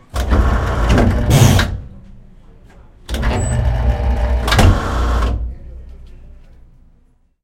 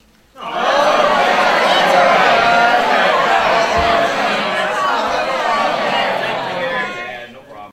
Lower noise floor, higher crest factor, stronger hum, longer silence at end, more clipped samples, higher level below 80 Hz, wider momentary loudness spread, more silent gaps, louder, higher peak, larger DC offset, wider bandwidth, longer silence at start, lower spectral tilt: first, -53 dBFS vs -35 dBFS; about the same, 16 dB vs 14 dB; neither; first, 1.1 s vs 0.05 s; neither; first, -20 dBFS vs -44 dBFS; first, 16 LU vs 10 LU; neither; about the same, -16 LUFS vs -14 LUFS; about the same, 0 dBFS vs 0 dBFS; neither; about the same, 16.5 kHz vs 15.5 kHz; second, 0.15 s vs 0.35 s; first, -5.5 dB/octave vs -3 dB/octave